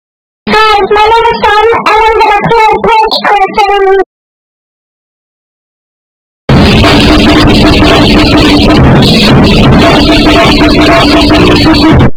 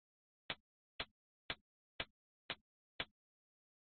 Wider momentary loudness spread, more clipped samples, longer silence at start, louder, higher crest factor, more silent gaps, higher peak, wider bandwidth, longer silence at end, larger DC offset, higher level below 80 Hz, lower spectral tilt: about the same, 3 LU vs 1 LU; first, 10% vs under 0.1%; about the same, 0.45 s vs 0.5 s; first, -4 LUFS vs -50 LUFS; second, 4 dB vs 26 dB; first, 4.06-6.48 s vs 0.60-0.99 s, 1.11-1.49 s, 1.61-1.99 s, 2.10-2.49 s, 2.61-2.99 s; first, 0 dBFS vs -28 dBFS; first, 19 kHz vs 4.5 kHz; second, 0 s vs 0.95 s; neither; first, -16 dBFS vs -72 dBFS; first, -6 dB/octave vs 0 dB/octave